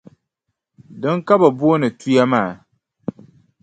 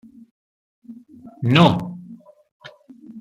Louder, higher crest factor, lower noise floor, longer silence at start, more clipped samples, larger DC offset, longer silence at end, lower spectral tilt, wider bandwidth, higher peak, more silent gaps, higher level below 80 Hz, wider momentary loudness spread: about the same, -17 LUFS vs -17 LUFS; about the same, 18 dB vs 22 dB; first, -77 dBFS vs -44 dBFS; about the same, 0.9 s vs 0.9 s; neither; neither; first, 1.1 s vs 0 s; about the same, -7 dB/octave vs -7 dB/octave; second, 9 kHz vs 10.5 kHz; about the same, 0 dBFS vs -2 dBFS; second, none vs 2.52-2.60 s; about the same, -62 dBFS vs -58 dBFS; second, 18 LU vs 28 LU